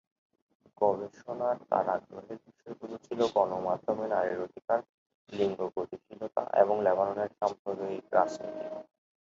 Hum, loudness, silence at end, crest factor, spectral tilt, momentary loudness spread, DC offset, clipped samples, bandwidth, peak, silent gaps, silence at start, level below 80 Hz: none; -31 LUFS; 0.45 s; 24 dB; -6 dB/octave; 16 LU; under 0.1%; under 0.1%; 7.8 kHz; -8 dBFS; 4.89-5.27 s, 7.59-7.65 s; 0.8 s; -72 dBFS